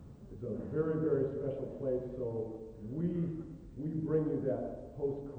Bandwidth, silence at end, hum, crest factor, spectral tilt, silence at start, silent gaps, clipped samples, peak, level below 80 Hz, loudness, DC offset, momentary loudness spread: 4.3 kHz; 0 s; none; 16 dB; -11 dB/octave; 0 s; none; under 0.1%; -20 dBFS; -58 dBFS; -37 LUFS; under 0.1%; 11 LU